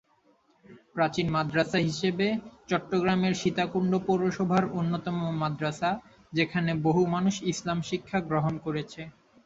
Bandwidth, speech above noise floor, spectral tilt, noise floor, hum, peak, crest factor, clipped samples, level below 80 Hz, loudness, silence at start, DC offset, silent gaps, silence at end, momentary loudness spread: 8 kHz; 38 dB; -6 dB/octave; -65 dBFS; none; -10 dBFS; 18 dB; under 0.1%; -60 dBFS; -28 LUFS; 0.7 s; under 0.1%; none; 0.35 s; 8 LU